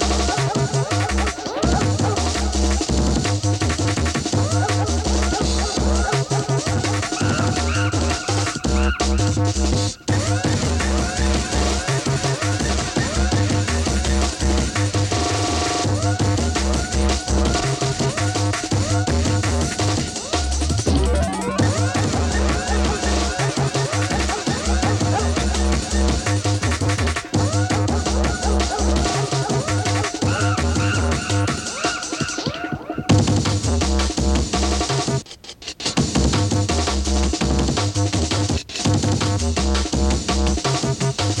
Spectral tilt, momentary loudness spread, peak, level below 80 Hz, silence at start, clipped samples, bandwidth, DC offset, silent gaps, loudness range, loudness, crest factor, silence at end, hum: -4.5 dB/octave; 2 LU; -4 dBFS; -26 dBFS; 0 s; under 0.1%; 12 kHz; under 0.1%; none; 1 LU; -20 LUFS; 16 dB; 0 s; none